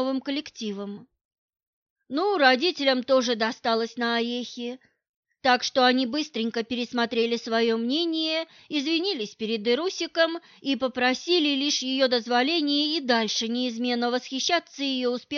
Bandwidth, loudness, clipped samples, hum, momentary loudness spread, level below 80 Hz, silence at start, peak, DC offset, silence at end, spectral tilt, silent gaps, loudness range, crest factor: 7.2 kHz; -25 LUFS; under 0.1%; none; 10 LU; -74 dBFS; 0 s; -6 dBFS; under 0.1%; 0 s; -2.5 dB/octave; 1.25-1.31 s, 1.38-1.53 s, 1.67-1.96 s, 5.09-5.23 s; 2 LU; 20 dB